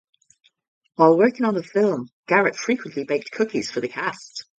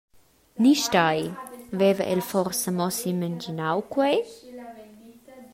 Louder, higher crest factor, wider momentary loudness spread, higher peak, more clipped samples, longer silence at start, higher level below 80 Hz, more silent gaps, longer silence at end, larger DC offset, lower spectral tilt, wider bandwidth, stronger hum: first, -21 LUFS vs -24 LUFS; about the same, 20 dB vs 20 dB; second, 11 LU vs 21 LU; first, -2 dBFS vs -6 dBFS; neither; first, 1 s vs 0.55 s; second, -70 dBFS vs -64 dBFS; first, 2.12-2.23 s vs none; about the same, 0.15 s vs 0.05 s; neither; about the same, -5.5 dB/octave vs -4.5 dB/octave; second, 9.2 kHz vs 16 kHz; neither